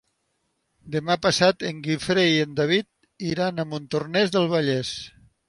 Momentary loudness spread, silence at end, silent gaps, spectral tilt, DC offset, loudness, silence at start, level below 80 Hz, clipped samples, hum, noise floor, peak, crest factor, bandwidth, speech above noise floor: 12 LU; 0.4 s; none; -5 dB/octave; under 0.1%; -23 LUFS; 0.85 s; -58 dBFS; under 0.1%; none; -73 dBFS; -4 dBFS; 20 dB; 11.5 kHz; 50 dB